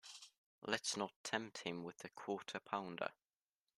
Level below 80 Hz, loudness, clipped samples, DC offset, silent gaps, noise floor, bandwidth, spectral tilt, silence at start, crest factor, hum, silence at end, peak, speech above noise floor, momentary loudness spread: -86 dBFS; -45 LUFS; under 0.1%; under 0.1%; 0.37-0.62 s, 1.16-1.24 s; under -90 dBFS; 13.5 kHz; -2.5 dB/octave; 0.05 s; 26 dB; none; 0.65 s; -22 dBFS; over 45 dB; 12 LU